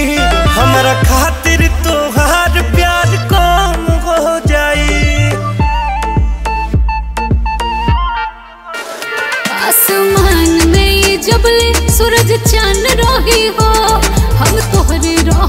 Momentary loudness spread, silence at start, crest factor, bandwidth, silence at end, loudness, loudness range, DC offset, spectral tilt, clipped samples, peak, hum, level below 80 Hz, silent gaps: 7 LU; 0 s; 10 dB; 16.5 kHz; 0 s; -11 LUFS; 6 LU; under 0.1%; -4 dB/octave; under 0.1%; 0 dBFS; none; -16 dBFS; none